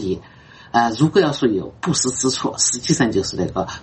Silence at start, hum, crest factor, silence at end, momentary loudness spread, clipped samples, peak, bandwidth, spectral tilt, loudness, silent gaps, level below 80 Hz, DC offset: 0 s; none; 18 dB; 0 s; 7 LU; under 0.1%; -2 dBFS; 8.8 kHz; -4 dB/octave; -19 LUFS; none; -48 dBFS; under 0.1%